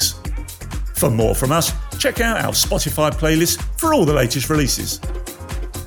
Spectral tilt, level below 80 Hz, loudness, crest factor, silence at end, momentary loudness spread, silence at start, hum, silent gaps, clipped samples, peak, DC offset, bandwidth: -4 dB/octave; -28 dBFS; -18 LUFS; 16 dB; 0 s; 13 LU; 0 s; none; none; under 0.1%; -4 dBFS; under 0.1%; 19 kHz